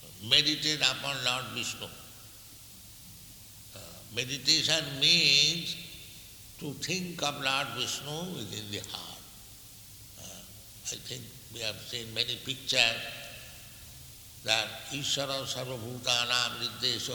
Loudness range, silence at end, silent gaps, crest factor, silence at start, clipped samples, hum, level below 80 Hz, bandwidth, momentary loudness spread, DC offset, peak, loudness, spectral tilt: 13 LU; 0 s; none; 26 dB; 0 s; under 0.1%; none; -62 dBFS; 19.5 kHz; 24 LU; under 0.1%; -6 dBFS; -28 LUFS; -1.5 dB/octave